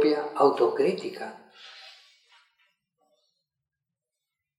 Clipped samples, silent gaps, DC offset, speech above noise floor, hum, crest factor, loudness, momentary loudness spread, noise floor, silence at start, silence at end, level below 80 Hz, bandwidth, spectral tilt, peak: under 0.1%; none; under 0.1%; 63 dB; none; 22 dB; -25 LUFS; 25 LU; -88 dBFS; 0 s; 2.7 s; under -90 dBFS; 11 kHz; -6 dB/octave; -8 dBFS